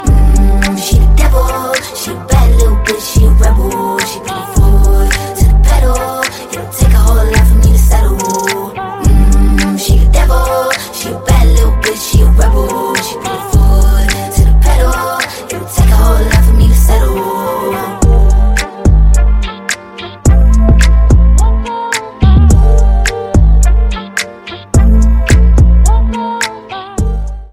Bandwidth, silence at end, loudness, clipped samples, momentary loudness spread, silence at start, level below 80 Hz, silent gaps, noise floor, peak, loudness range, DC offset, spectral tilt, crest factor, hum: 16 kHz; 0.05 s; -11 LUFS; 2%; 9 LU; 0 s; -8 dBFS; none; -28 dBFS; 0 dBFS; 2 LU; under 0.1%; -5.5 dB/octave; 8 dB; none